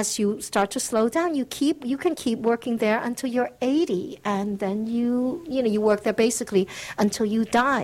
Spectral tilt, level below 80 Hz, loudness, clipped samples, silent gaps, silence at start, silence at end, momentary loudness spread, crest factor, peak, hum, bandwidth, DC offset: -4.5 dB/octave; -58 dBFS; -24 LUFS; under 0.1%; none; 0 s; 0 s; 5 LU; 16 dB; -6 dBFS; none; 16 kHz; under 0.1%